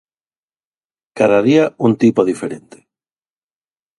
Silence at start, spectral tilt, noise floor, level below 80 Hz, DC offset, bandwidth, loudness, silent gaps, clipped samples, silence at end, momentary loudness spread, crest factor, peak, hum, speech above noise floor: 1.15 s; -7 dB/octave; under -90 dBFS; -60 dBFS; under 0.1%; 11.5 kHz; -14 LUFS; none; under 0.1%; 1.4 s; 13 LU; 18 dB; 0 dBFS; none; over 76 dB